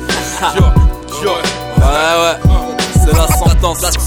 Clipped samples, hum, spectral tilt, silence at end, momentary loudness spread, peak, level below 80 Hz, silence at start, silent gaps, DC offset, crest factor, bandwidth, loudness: under 0.1%; none; -4.5 dB/octave; 0 s; 5 LU; 0 dBFS; -14 dBFS; 0 s; none; under 0.1%; 12 dB; 18 kHz; -12 LUFS